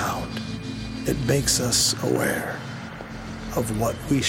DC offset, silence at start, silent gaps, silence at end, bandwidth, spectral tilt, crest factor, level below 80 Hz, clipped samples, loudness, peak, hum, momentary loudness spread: under 0.1%; 0 s; none; 0 s; 17 kHz; -3.5 dB/octave; 18 dB; -42 dBFS; under 0.1%; -24 LUFS; -8 dBFS; none; 15 LU